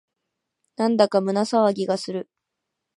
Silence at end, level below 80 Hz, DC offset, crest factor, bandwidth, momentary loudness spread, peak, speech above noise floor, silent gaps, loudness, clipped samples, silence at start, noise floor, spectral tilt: 0.75 s; -76 dBFS; under 0.1%; 20 dB; 11.5 kHz; 9 LU; -4 dBFS; 61 dB; none; -22 LUFS; under 0.1%; 0.8 s; -82 dBFS; -5.5 dB/octave